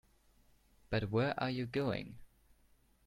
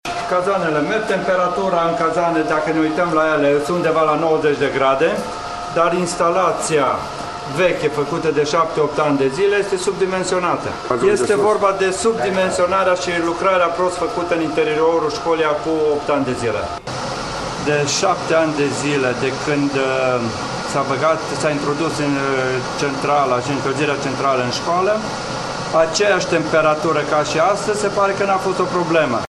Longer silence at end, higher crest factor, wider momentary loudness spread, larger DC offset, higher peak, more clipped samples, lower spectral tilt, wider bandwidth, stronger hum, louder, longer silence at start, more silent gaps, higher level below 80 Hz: first, 0.8 s vs 0 s; about the same, 18 dB vs 16 dB; about the same, 7 LU vs 5 LU; second, under 0.1% vs 0.1%; second, -20 dBFS vs -2 dBFS; neither; first, -7.5 dB/octave vs -4.5 dB/octave; first, 14 kHz vs 12.5 kHz; neither; second, -37 LUFS vs -18 LUFS; first, 0.9 s vs 0.05 s; neither; second, -60 dBFS vs -48 dBFS